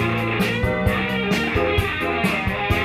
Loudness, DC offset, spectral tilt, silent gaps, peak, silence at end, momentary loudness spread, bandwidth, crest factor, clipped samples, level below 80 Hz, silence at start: -21 LUFS; under 0.1%; -6 dB/octave; none; -6 dBFS; 0 s; 1 LU; 16 kHz; 16 dB; under 0.1%; -34 dBFS; 0 s